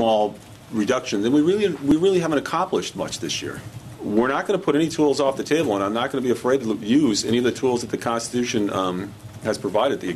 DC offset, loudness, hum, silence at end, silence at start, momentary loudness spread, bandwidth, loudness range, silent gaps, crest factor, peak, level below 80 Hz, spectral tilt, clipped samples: under 0.1%; -22 LUFS; none; 0 s; 0 s; 9 LU; 13.5 kHz; 2 LU; none; 16 dB; -6 dBFS; -54 dBFS; -5 dB/octave; under 0.1%